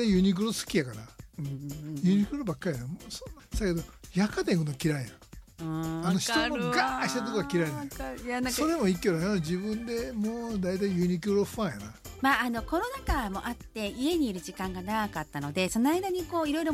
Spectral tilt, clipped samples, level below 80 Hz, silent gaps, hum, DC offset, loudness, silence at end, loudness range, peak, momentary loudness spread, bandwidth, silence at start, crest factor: -5 dB/octave; under 0.1%; -46 dBFS; none; none; under 0.1%; -30 LUFS; 0 s; 3 LU; -12 dBFS; 11 LU; 16 kHz; 0 s; 18 dB